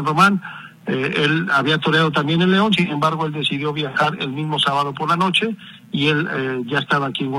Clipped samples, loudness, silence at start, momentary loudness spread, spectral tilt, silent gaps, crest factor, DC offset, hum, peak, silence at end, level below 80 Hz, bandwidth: under 0.1%; -18 LUFS; 0 s; 9 LU; -5.5 dB/octave; none; 16 dB; under 0.1%; none; -2 dBFS; 0 s; -60 dBFS; 13.5 kHz